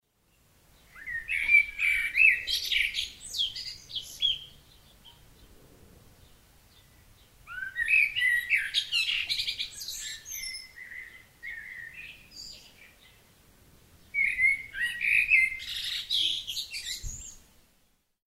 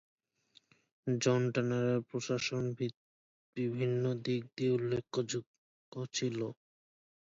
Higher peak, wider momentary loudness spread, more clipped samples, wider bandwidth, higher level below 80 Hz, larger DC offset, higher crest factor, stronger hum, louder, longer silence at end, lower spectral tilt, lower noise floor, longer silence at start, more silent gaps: first, -8 dBFS vs -16 dBFS; first, 22 LU vs 9 LU; neither; first, 16 kHz vs 7.8 kHz; first, -56 dBFS vs -74 dBFS; neither; about the same, 22 dB vs 20 dB; neither; first, -26 LUFS vs -35 LUFS; about the same, 0.95 s vs 0.85 s; second, 1.5 dB/octave vs -5.5 dB/octave; about the same, -69 dBFS vs -69 dBFS; about the same, 0.95 s vs 1.05 s; second, none vs 2.94-3.53 s, 5.47-5.92 s